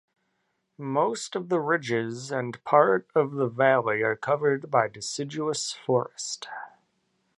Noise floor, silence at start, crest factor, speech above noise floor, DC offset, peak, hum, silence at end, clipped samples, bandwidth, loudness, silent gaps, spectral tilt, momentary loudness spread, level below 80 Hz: -76 dBFS; 0.8 s; 22 dB; 50 dB; under 0.1%; -6 dBFS; none; 0.7 s; under 0.1%; 11.5 kHz; -26 LUFS; none; -4.5 dB/octave; 12 LU; -74 dBFS